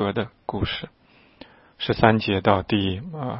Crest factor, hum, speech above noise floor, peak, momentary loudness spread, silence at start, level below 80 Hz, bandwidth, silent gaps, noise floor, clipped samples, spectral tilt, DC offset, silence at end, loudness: 24 dB; none; 26 dB; 0 dBFS; 13 LU; 0 s; -46 dBFS; 5.8 kHz; none; -49 dBFS; under 0.1%; -10 dB/octave; under 0.1%; 0 s; -23 LUFS